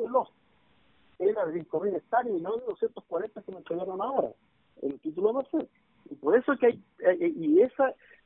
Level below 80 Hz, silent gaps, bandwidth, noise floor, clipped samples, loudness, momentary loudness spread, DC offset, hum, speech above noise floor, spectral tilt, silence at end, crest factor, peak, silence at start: -74 dBFS; none; 3.9 kHz; -66 dBFS; under 0.1%; -29 LUFS; 13 LU; under 0.1%; none; 38 dB; -10 dB/octave; 0.3 s; 18 dB; -10 dBFS; 0 s